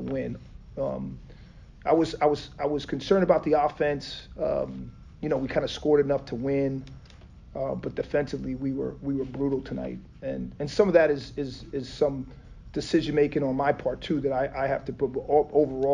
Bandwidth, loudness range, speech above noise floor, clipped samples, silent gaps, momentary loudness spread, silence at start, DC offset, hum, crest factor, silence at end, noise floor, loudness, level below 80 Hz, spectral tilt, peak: 9.4 kHz; 5 LU; 22 dB; under 0.1%; none; 14 LU; 0 s; under 0.1%; none; 20 dB; 0 s; -48 dBFS; -27 LUFS; -48 dBFS; -7 dB/octave; -6 dBFS